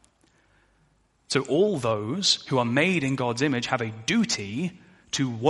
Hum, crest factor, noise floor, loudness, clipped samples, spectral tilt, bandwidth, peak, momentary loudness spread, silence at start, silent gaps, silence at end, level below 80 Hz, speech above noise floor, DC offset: none; 20 dB; -65 dBFS; -25 LUFS; under 0.1%; -4 dB/octave; 11.5 kHz; -6 dBFS; 7 LU; 1.3 s; none; 0 s; -62 dBFS; 40 dB; under 0.1%